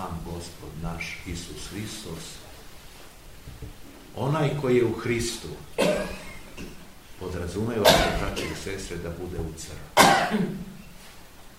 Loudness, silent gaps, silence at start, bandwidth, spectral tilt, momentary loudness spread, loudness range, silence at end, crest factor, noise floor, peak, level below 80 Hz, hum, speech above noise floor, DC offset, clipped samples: -26 LUFS; none; 0 s; 16 kHz; -4 dB/octave; 27 LU; 14 LU; 0 s; 26 dB; -47 dBFS; -2 dBFS; -42 dBFS; none; 20 dB; 0.3%; under 0.1%